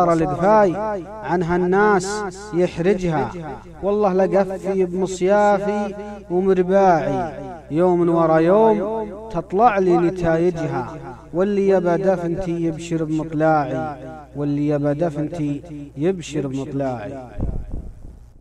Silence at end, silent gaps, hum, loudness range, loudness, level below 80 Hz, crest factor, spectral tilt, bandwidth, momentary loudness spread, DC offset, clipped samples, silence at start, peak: 0 s; none; none; 6 LU; -20 LUFS; -40 dBFS; 16 dB; -7 dB/octave; 10.5 kHz; 13 LU; under 0.1%; under 0.1%; 0 s; -2 dBFS